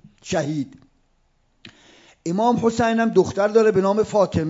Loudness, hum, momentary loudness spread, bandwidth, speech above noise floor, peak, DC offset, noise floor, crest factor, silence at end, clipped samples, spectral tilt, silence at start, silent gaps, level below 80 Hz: -20 LUFS; none; 11 LU; 7.8 kHz; 44 dB; -4 dBFS; under 0.1%; -63 dBFS; 16 dB; 0 s; under 0.1%; -6 dB/octave; 0.25 s; none; -56 dBFS